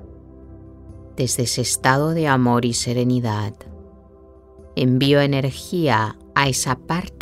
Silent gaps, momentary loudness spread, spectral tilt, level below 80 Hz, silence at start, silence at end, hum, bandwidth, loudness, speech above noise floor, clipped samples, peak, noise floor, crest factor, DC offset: none; 9 LU; -4.5 dB/octave; -46 dBFS; 0 s; 0 s; none; 15.5 kHz; -19 LUFS; 27 dB; under 0.1%; -2 dBFS; -46 dBFS; 20 dB; under 0.1%